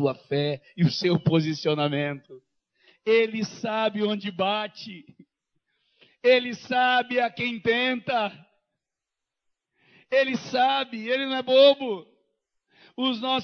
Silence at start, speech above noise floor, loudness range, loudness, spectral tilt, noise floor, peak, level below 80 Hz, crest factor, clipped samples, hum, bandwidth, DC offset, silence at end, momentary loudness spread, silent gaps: 0 s; 63 dB; 4 LU; -24 LUFS; -6 dB/octave; -87 dBFS; -6 dBFS; -70 dBFS; 20 dB; under 0.1%; none; 6.6 kHz; under 0.1%; 0 s; 10 LU; none